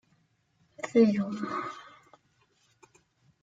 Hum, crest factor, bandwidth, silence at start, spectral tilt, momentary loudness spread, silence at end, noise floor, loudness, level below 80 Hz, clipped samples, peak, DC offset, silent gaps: none; 20 dB; 7.8 kHz; 0.85 s; -7 dB/octave; 18 LU; 1.6 s; -70 dBFS; -28 LUFS; -76 dBFS; under 0.1%; -12 dBFS; under 0.1%; none